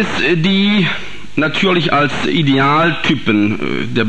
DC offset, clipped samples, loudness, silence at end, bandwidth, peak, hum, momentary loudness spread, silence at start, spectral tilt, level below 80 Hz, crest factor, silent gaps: 5%; under 0.1%; -14 LUFS; 0 s; 9.6 kHz; -2 dBFS; none; 6 LU; 0 s; -6 dB/octave; -44 dBFS; 14 dB; none